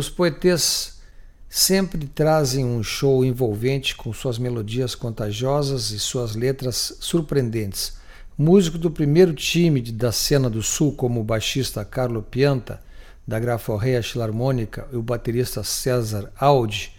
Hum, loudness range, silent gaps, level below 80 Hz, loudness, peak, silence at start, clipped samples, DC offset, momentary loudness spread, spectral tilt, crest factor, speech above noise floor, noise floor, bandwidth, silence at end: none; 5 LU; none; -40 dBFS; -21 LUFS; -2 dBFS; 0 s; under 0.1%; under 0.1%; 10 LU; -5 dB/octave; 18 dB; 21 dB; -42 dBFS; 17.5 kHz; 0.05 s